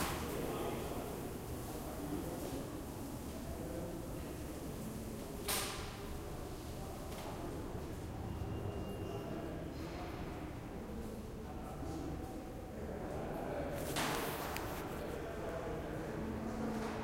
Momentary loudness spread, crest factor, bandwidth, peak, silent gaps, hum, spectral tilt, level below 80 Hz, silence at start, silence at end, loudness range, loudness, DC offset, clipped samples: 7 LU; 22 dB; 16 kHz; -22 dBFS; none; none; -5 dB/octave; -52 dBFS; 0 s; 0 s; 4 LU; -43 LUFS; under 0.1%; under 0.1%